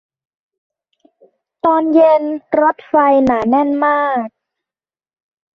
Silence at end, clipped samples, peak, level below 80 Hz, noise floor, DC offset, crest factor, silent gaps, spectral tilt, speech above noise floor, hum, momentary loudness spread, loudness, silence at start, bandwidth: 1.3 s; under 0.1%; 0 dBFS; -54 dBFS; under -90 dBFS; under 0.1%; 16 dB; none; -7.5 dB/octave; over 77 dB; none; 8 LU; -14 LUFS; 1.65 s; 6.6 kHz